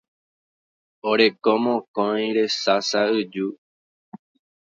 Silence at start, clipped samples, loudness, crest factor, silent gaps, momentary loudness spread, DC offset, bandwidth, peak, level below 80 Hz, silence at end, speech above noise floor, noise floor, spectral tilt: 1.05 s; under 0.1%; -22 LUFS; 20 dB; 1.88-1.94 s, 3.58-4.12 s; 10 LU; under 0.1%; 7.6 kHz; -4 dBFS; -74 dBFS; 0.5 s; over 69 dB; under -90 dBFS; -4 dB/octave